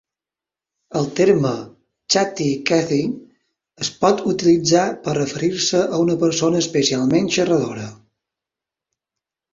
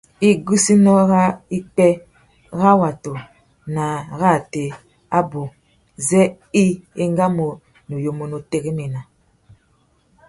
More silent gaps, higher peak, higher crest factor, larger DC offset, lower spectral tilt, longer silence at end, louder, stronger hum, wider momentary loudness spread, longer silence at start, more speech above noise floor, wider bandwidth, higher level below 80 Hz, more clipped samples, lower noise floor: neither; about the same, -2 dBFS vs -2 dBFS; about the same, 18 dB vs 18 dB; neither; second, -4.5 dB/octave vs -6 dB/octave; first, 1.6 s vs 1.25 s; about the same, -18 LUFS vs -18 LUFS; neither; second, 11 LU vs 16 LU; first, 0.9 s vs 0.2 s; first, 71 dB vs 43 dB; second, 7.8 kHz vs 11.5 kHz; about the same, -58 dBFS vs -54 dBFS; neither; first, -89 dBFS vs -60 dBFS